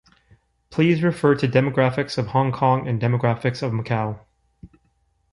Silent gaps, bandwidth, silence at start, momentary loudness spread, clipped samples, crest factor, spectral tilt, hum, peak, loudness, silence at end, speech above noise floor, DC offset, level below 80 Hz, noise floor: none; 11 kHz; 0.7 s; 7 LU; under 0.1%; 18 dB; -8 dB/octave; none; -4 dBFS; -21 LUFS; 0.65 s; 46 dB; under 0.1%; -54 dBFS; -66 dBFS